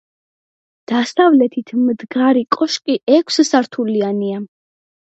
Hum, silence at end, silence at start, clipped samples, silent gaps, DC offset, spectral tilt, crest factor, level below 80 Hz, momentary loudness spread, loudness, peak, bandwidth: none; 0.65 s; 0.9 s; under 0.1%; 3.03-3.07 s; under 0.1%; -4.5 dB/octave; 16 dB; -70 dBFS; 9 LU; -16 LUFS; 0 dBFS; 8.2 kHz